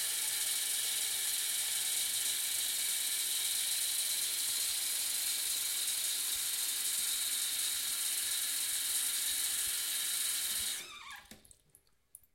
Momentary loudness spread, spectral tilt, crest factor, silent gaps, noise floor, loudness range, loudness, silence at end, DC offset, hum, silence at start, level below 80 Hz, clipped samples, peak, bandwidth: 1 LU; 3.5 dB/octave; 16 dB; none; -68 dBFS; 1 LU; -32 LUFS; 0.95 s; under 0.1%; none; 0 s; -74 dBFS; under 0.1%; -20 dBFS; 16.5 kHz